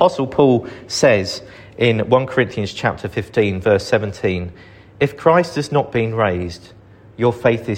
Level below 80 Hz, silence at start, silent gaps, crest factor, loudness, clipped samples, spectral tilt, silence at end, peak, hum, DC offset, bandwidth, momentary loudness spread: -48 dBFS; 0 s; none; 18 dB; -18 LUFS; under 0.1%; -6 dB/octave; 0 s; 0 dBFS; none; under 0.1%; 16 kHz; 11 LU